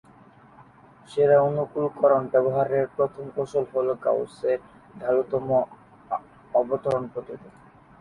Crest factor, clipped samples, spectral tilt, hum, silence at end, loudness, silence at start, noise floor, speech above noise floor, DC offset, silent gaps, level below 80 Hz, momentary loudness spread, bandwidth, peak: 18 dB; under 0.1%; -8 dB/octave; none; 0.5 s; -25 LUFS; 1.1 s; -52 dBFS; 28 dB; under 0.1%; none; -64 dBFS; 13 LU; 10.5 kHz; -8 dBFS